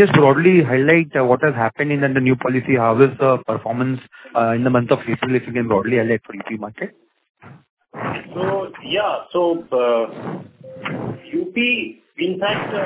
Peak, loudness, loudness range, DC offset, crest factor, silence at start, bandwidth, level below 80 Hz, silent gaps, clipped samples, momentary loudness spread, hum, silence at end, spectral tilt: 0 dBFS; -18 LUFS; 8 LU; under 0.1%; 18 dB; 0 s; 4 kHz; -56 dBFS; 7.30-7.35 s, 7.69-7.77 s; under 0.1%; 15 LU; none; 0 s; -10.5 dB/octave